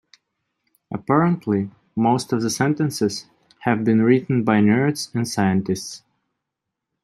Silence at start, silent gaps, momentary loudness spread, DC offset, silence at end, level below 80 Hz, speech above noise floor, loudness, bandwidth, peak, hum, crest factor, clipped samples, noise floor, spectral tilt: 0.9 s; none; 12 LU; under 0.1%; 1.05 s; -62 dBFS; 63 dB; -20 LUFS; 13 kHz; -2 dBFS; none; 18 dB; under 0.1%; -82 dBFS; -6 dB/octave